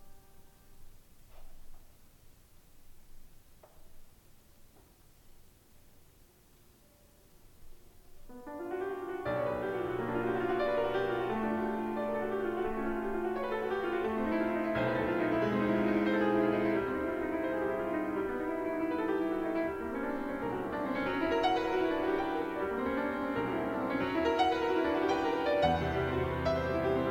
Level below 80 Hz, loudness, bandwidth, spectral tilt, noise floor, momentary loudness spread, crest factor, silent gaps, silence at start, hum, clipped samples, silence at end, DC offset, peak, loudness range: -54 dBFS; -33 LUFS; 17 kHz; -7 dB/octave; -62 dBFS; 6 LU; 18 dB; none; 0 s; none; under 0.1%; 0 s; under 0.1%; -16 dBFS; 6 LU